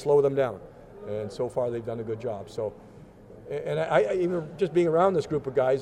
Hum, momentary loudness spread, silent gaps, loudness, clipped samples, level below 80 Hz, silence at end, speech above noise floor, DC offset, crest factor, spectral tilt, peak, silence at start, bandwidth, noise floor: none; 14 LU; none; -27 LUFS; under 0.1%; -58 dBFS; 0 s; 22 dB; under 0.1%; 18 dB; -7 dB/octave; -10 dBFS; 0 s; 10.5 kHz; -48 dBFS